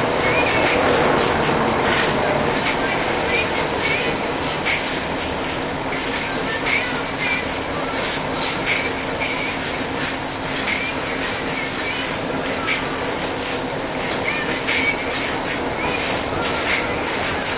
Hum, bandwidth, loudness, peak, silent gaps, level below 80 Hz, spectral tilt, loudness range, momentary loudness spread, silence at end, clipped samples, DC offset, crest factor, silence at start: none; 4 kHz; -21 LUFS; -4 dBFS; none; -40 dBFS; -8.5 dB/octave; 4 LU; 6 LU; 0 s; under 0.1%; under 0.1%; 16 dB; 0 s